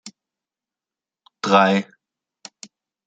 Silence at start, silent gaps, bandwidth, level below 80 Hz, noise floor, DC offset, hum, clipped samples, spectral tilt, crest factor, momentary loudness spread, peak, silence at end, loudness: 0.05 s; none; 9 kHz; -72 dBFS; under -90 dBFS; under 0.1%; none; under 0.1%; -5 dB/octave; 22 dB; 25 LU; -2 dBFS; 1.25 s; -18 LUFS